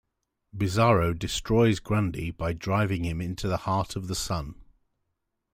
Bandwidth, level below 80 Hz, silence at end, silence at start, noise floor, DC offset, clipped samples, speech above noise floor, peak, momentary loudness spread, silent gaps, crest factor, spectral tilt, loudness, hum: 16 kHz; -46 dBFS; 0.9 s; 0.55 s; -80 dBFS; under 0.1%; under 0.1%; 54 dB; -10 dBFS; 9 LU; none; 18 dB; -6 dB/octave; -27 LUFS; none